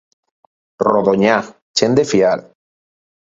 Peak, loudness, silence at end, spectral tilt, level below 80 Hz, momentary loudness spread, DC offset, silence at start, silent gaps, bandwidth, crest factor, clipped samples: 0 dBFS; -15 LUFS; 0.9 s; -4.5 dB/octave; -56 dBFS; 6 LU; under 0.1%; 0.8 s; 1.62-1.74 s; 7.8 kHz; 18 dB; under 0.1%